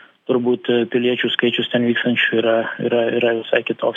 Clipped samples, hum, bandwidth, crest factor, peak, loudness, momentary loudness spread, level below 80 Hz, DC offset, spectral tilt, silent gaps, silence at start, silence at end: under 0.1%; none; 3.8 kHz; 16 dB; -2 dBFS; -18 LUFS; 3 LU; -86 dBFS; under 0.1%; -7 dB/octave; none; 0.3 s; 0 s